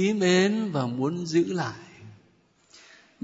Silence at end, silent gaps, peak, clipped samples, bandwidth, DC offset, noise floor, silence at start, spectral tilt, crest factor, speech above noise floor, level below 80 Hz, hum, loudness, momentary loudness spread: 1.1 s; none; -10 dBFS; under 0.1%; 8 kHz; under 0.1%; -62 dBFS; 0 s; -5.5 dB/octave; 16 dB; 38 dB; -72 dBFS; none; -25 LUFS; 11 LU